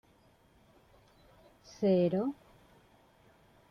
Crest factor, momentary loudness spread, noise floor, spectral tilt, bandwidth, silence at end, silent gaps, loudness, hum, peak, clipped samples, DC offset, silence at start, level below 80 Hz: 18 dB; 24 LU; -65 dBFS; -8.5 dB/octave; 6.8 kHz; 1.35 s; none; -31 LUFS; none; -18 dBFS; under 0.1%; under 0.1%; 1.8 s; -70 dBFS